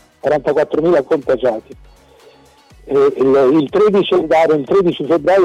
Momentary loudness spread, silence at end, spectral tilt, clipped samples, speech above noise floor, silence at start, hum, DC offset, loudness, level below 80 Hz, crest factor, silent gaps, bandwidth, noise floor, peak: 5 LU; 0 s; -7 dB/octave; under 0.1%; 33 dB; 0.25 s; none; under 0.1%; -14 LUFS; -48 dBFS; 8 dB; none; 9.4 kHz; -46 dBFS; -6 dBFS